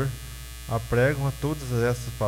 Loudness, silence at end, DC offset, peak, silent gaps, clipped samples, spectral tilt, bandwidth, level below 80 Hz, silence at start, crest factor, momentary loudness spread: -26 LUFS; 0 s; under 0.1%; -10 dBFS; none; under 0.1%; -6 dB/octave; 16.5 kHz; -40 dBFS; 0 s; 16 dB; 15 LU